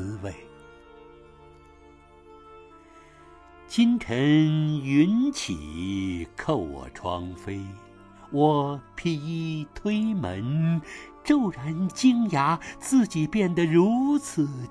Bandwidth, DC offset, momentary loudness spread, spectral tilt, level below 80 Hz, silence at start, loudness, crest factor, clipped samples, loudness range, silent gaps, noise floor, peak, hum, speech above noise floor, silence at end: 11 kHz; under 0.1%; 14 LU; -6.5 dB/octave; -52 dBFS; 0 s; -25 LUFS; 18 dB; under 0.1%; 6 LU; none; -52 dBFS; -8 dBFS; none; 28 dB; 0 s